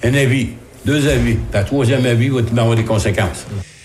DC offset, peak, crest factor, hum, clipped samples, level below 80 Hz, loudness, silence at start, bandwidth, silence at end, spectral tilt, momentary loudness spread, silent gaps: under 0.1%; -4 dBFS; 12 dB; none; under 0.1%; -32 dBFS; -16 LUFS; 0 s; 13.5 kHz; 0.15 s; -6 dB/octave; 9 LU; none